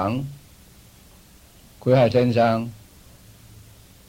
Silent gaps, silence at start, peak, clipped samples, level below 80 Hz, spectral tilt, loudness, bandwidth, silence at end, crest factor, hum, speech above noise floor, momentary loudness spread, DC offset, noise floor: none; 0 s; -6 dBFS; under 0.1%; -52 dBFS; -7.5 dB/octave; -20 LUFS; 16.5 kHz; 1.35 s; 18 dB; none; 31 dB; 16 LU; under 0.1%; -50 dBFS